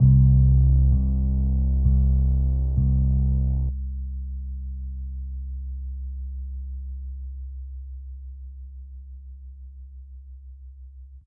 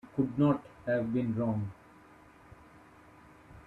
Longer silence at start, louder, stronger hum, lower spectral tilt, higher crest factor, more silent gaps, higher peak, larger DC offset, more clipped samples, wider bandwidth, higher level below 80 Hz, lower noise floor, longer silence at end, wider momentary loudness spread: about the same, 0 s vs 0.05 s; first, -24 LUFS vs -32 LUFS; first, 60 Hz at -55 dBFS vs none; first, -16.5 dB/octave vs -10 dB/octave; about the same, 16 dB vs 18 dB; neither; first, -8 dBFS vs -16 dBFS; neither; neither; second, 1 kHz vs 4.9 kHz; first, -24 dBFS vs -62 dBFS; second, -43 dBFS vs -57 dBFS; about the same, 0.05 s vs 0.05 s; first, 25 LU vs 7 LU